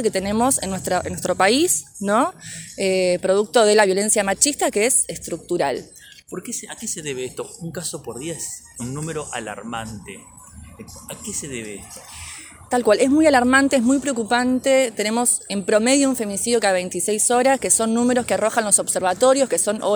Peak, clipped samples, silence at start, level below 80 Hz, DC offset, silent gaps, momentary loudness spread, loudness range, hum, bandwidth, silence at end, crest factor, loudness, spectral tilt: 0 dBFS; under 0.1%; 0 s; -52 dBFS; under 0.1%; none; 17 LU; 13 LU; none; over 20 kHz; 0 s; 20 dB; -19 LUFS; -3 dB/octave